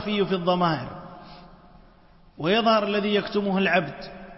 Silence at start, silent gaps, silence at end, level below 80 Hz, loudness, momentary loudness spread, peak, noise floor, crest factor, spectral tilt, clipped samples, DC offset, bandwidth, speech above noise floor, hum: 0 s; none; 0 s; -54 dBFS; -23 LUFS; 19 LU; -8 dBFS; -53 dBFS; 18 dB; -9 dB/octave; under 0.1%; under 0.1%; 5.8 kHz; 30 dB; none